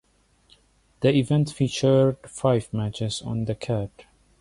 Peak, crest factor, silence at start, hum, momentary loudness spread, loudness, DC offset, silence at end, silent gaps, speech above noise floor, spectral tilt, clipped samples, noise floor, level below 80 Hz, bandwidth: -8 dBFS; 18 dB; 1 s; none; 9 LU; -24 LUFS; under 0.1%; 0.55 s; none; 39 dB; -6.5 dB/octave; under 0.1%; -62 dBFS; -52 dBFS; 11.5 kHz